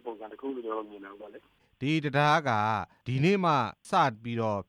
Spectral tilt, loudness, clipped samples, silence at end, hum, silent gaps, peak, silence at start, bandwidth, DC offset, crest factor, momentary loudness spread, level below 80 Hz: -6.5 dB/octave; -28 LUFS; under 0.1%; 0.05 s; none; none; -12 dBFS; 0.05 s; 11.5 kHz; under 0.1%; 16 dB; 20 LU; -68 dBFS